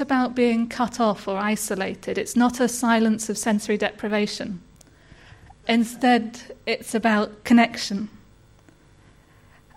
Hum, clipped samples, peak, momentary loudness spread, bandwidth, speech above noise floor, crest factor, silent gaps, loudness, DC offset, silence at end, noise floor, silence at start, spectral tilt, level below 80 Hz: none; under 0.1%; -6 dBFS; 11 LU; 15 kHz; 31 dB; 18 dB; none; -23 LUFS; under 0.1%; 1.65 s; -53 dBFS; 0 s; -4 dB/octave; -56 dBFS